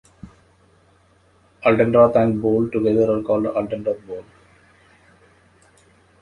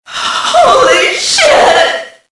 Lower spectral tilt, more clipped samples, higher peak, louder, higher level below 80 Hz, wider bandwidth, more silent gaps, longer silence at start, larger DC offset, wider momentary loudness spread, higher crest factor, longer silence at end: first, -9 dB/octave vs -0.5 dB/octave; second, under 0.1% vs 0.7%; about the same, -2 dBFS vs 0 dBFS; second, -19 LUFS vs -7 LUFS; second, -54 dBFS vs -44 dBFS; about the same, 10.5 kHz vs 11.5 kHz; neither; first, 0.25 s vs 0.1 s; neither; first, 13 LU vs 7 LU; first, 20 dB vs 8 dB; first, 2 s vs 0.25 s